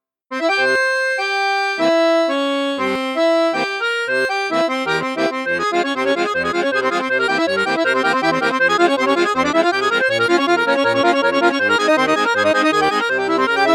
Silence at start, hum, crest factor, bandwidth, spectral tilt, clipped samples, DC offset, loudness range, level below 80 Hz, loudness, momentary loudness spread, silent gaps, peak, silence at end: 0.3 s; none; 16 dB; 15 kHz; -3.5 dB/octave; under 0.1%; under 0.1%; 3 LU; -60 dBFS; -16 LUFS; 4 LU; none; -2 dBFS; 0 s